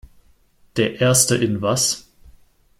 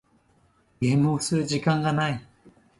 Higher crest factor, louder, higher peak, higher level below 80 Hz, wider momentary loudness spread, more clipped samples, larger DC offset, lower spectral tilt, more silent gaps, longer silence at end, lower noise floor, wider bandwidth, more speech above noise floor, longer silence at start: about the same, 20 dB vs 18 dB; first, -18 LUFS vs -25 LUFS; first, 0 dBFS vs -8 dBFS; first, -50 dBFS vs -58 dBFS; first, 11 LU vs 6 LU; neither; neither; second, -3.5 dB/octave vs -5.5 dB/octave; neither; first, 0.8 s vs 0.3 s; second, -55 dBFS vs -63 dBFS; first, 16.5 kHz vs 11.5 kHz; about the same, 37 dB vs 40 dB; about the same, 0.75 s vs 0.8 s